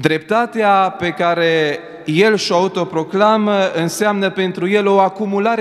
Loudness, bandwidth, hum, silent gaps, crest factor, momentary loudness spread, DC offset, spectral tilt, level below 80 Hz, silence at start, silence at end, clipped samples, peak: -15 LUFS; 15 kHz; none; none; 16 dB; 6 LU; under 0.1%; -5 dB/octave; -60 dBFS; 0 s; 0 s; under 0.1%; 0 dBFS